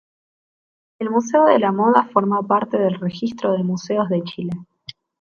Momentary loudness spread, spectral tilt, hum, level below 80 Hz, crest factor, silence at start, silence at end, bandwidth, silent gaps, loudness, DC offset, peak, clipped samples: 14 LU; -6.5 dB/octave; none; -64 dBFS; 20 dB; 1 s; 0.3 s; 7.2 kHz; none; -19 LUFS; under 0.1%; 0 dBFS; under 0.1%